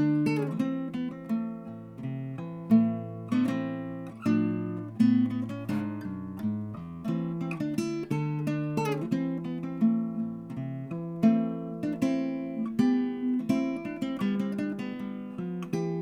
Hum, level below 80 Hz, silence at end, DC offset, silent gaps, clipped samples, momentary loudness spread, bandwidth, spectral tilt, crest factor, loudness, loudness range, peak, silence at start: none; -66 dBFS; 0 s; under 0.1%; none; under 0.1%; 11 LU; 13.5 kHz; -8 dB/octave; 18 dB; -30 LUFS; 3 LU; -10 dBFS; 0 s